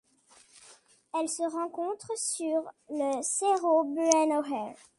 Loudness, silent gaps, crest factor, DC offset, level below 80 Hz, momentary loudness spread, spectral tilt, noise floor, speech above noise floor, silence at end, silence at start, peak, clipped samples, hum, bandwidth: -29 LUFS; none; 26 dB; under 0.1%; -78 dBFS; 10 LU; -2 dB/octave; -61 dBFS; 32 dB; 0.25 s; 0.55 s; -4 dBFS; under 0.1%; none; 11.5 kHz